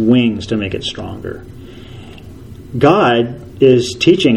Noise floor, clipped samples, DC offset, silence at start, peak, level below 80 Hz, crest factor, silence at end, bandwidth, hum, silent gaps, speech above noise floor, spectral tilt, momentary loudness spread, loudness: -34 dBFS; under 0.1%; under 0.1%; 0 s; 0 dBFS; -42 dBFS; 14 dB; 0 s; 11.5 kHz; none; none; 20 dB; -6 dB/octave; 24 LU; -14 LUFS